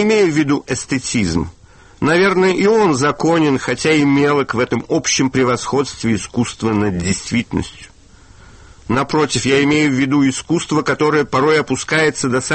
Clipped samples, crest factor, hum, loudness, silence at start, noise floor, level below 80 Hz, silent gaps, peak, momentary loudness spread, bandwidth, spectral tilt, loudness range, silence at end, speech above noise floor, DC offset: under 0.1%; 14 dB; none; -16 LUFS; 0 s; -44 dBFS; -42 dBFS; none; -2 dBFS; 7 LU; 8.8 kHz; -4.5 dB/octave; 5 LU; 0 s; 28 dB; under 0.1%